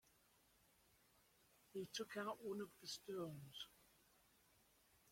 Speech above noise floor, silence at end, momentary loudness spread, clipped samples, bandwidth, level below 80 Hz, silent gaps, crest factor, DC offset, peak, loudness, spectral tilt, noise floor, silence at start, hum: 26 dB; 0 s; 8 LU; under 0.1%; 16.5 kHz; -86 dBFS; none; 20 dB; under 0.1%; -36 dBFS; -51 LUFS; -4 dB/octave; -77 dBFS; 1.7 s; none